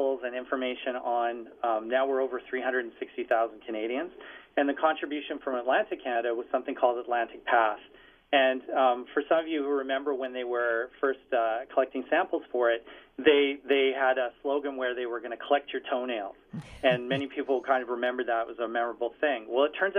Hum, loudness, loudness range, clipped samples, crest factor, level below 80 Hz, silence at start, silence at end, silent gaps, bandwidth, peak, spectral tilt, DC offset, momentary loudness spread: none; -29 LUFS; 3 LU; under 0.1%; 20 dB; -68 dBFS; 0 s; 0 s; none; 4.4 kHz; -8 dBFS; -6.5 dB/octave; under 0.1%; 8 LU